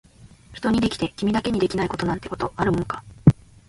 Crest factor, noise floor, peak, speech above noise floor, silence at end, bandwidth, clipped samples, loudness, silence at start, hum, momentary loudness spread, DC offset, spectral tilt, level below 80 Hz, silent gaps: 22 dB; -48 dBFS; 0 dBFS; 25 dB; 0.35 s; 11.5 kHz; under 0.1%; -23 LUFS; 0.5 s; none; 9 LU; under 0.1%; -7 dB/octave; -42 dBFS; none